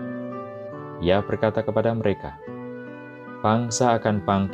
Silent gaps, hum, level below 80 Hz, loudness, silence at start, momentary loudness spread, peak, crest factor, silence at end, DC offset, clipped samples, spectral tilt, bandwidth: none; none; -52 dBFS; -24 LUFS; 0 s; 16 LU; -6 dBFS; 18 dB; 0 s; under 0.1%; under 0.1%; -5.5 dB/octave; 11.5 kHz